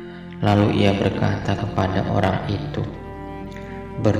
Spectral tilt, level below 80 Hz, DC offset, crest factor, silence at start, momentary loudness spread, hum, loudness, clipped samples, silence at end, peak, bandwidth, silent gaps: -7.5 dB/octave; -42 dBFS; under 0.1%; 18 dB; 0 s; 16 LU; none; -21 LUFS; under 0.1%; 0 s; -4 dBFS; 9.6 kHz; none